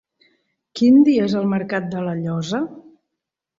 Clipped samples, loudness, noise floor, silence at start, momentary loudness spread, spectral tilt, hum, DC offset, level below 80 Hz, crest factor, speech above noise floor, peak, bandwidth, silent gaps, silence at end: under 0.1%; -18 LUFS; -82 dBFS; 0.75 s; 13 LU; -7 dB/octave; none; under 0.1%; -62 dBFS; 16 dB; 65 dB; -4 dBFS; 7.6 kHz; none; 0.8 s